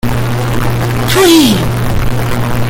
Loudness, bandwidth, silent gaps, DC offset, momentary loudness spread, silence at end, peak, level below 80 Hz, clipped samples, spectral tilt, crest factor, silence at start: -11 LUFS; 17.5 kHz; none; under 0.1%; 9 LU; 0 s; 0 dBFS; -22 dBFS; under 0.1%; -5 dB/octave; 10 dB; 0.05 s